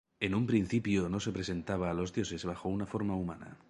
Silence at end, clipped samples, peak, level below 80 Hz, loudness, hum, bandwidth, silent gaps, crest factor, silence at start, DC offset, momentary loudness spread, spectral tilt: 0.15 s; under 0.1%; -14 dBFS; -54 dBFS; -34 LUFS; none; 11 kHz; none; 20 dB; 0.2 s; under 0.1%; 7 LU; -6 dB/octave